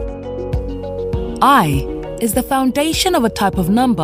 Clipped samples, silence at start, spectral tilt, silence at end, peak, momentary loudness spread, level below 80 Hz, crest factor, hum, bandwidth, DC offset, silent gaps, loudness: under 0.1%; 0 s; -5 dB/octave; 0 s; 0 dBFS; 12 LU; -30 dBFS; 16 dB; none; 16 kHz; under 0.1%; none; -17 LUFS